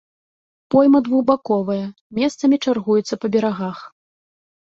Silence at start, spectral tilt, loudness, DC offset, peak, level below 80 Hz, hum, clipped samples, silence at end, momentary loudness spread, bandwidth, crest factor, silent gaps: 0.7 s; -6.5 dB/octave; -19 LUFS; under 0.1%; -2 dBFS; -62 dBFS; none; under 0.1%; 0.8 s; 12 LU; 7.8 kHz; 16 dB; 2.01-2.10 s